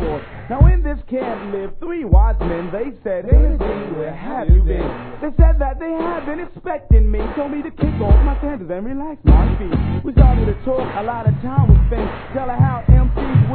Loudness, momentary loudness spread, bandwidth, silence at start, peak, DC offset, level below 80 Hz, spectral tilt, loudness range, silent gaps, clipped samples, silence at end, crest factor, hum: -18 LUFS; 12 LU; 4.2 kHz; 0 s; 0 dBFS; under 0.1%; -18 dBFS; -12.5 dB/octave; 3 LU; none; under 0.1%; 0 s; 16 dB; none